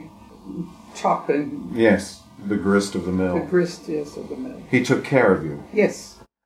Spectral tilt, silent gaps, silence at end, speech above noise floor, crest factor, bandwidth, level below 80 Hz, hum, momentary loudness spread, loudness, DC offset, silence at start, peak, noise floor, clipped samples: -6 dB/octave; none; 0.3 s; 20 dB; 20 dB; 15 kHz; -54 dBFS; none; 16 LU; -22 LUFS; under 0.1%; 0 s; -2 dBFS; -41 dBFS; under 0.1%